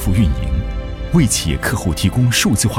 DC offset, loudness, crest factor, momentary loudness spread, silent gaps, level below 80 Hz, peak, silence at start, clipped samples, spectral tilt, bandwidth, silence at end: under 0.1%; -17 LUFS; 16 dB; 8 LU; none; -24 dBFS; 0 dBFS; 0 s; under 0.1%; -4.5 dB/octave; 16.5 kHz; 0 s